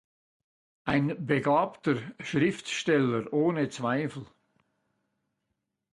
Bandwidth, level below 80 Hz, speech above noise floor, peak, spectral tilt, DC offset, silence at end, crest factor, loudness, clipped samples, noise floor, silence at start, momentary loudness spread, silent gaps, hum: 11.5 kHz; -64 dBFS; 54 dB; -10 dBFS; -6 dB/octave; under 0.1%; 1.7 s; 20 dB; -28 LUFS; under 0.1%; -82 dBFS; 0.85 s; 7 LU; none; none